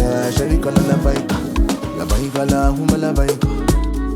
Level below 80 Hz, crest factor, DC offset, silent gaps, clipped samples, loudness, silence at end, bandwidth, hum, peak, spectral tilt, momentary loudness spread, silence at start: -20 dBFS; 16 dB; under 0.1%; none; under 0.1%; -18 LUFS; 0 s; 16.5 kHz; none; 0 dBFS; -6 dB/octave; 4 LU; 0 s